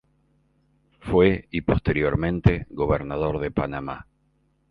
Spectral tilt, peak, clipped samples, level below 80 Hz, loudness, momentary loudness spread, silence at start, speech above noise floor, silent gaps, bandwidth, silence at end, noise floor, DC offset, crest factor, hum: -9.5 dB/octave; -4 dBFS; under 0.1%; -38 dBFS; -23 LUFS; 12 LU; 1.05 s; 44 dB; none; 5.2 kHz; 0.7 s; -66 dBFS; under 0.1%; 20 dB; none